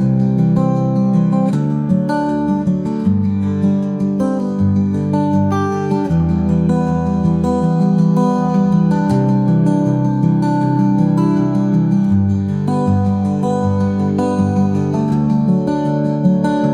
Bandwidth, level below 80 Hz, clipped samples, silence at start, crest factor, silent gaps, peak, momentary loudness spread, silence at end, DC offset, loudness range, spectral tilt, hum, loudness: 9.6 kHz; -44 dBFS; under 0.1%; 0 s; 12 dB; none; -2 dBFS; 3 LU; 0 s; 0.2%; 2 LU; -9.5 dB/octave; none; -15 LUFS